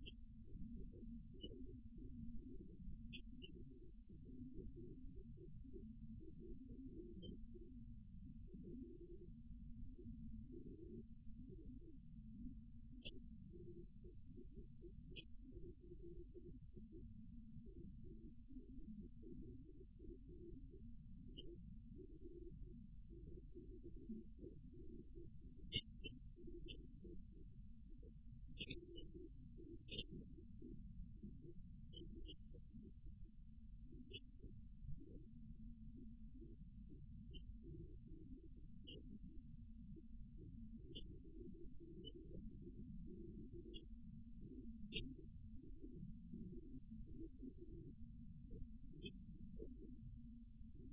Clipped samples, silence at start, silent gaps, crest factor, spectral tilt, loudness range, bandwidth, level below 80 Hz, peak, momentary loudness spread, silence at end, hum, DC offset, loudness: under 0.1%; 0 s; none; 28 dB; -10 dB/octave; 5 LU; 3.7 kHz; -60 dBFS; -28 dBFS; 5 LU; 0 s; none; under 0.1%; -59 LUFS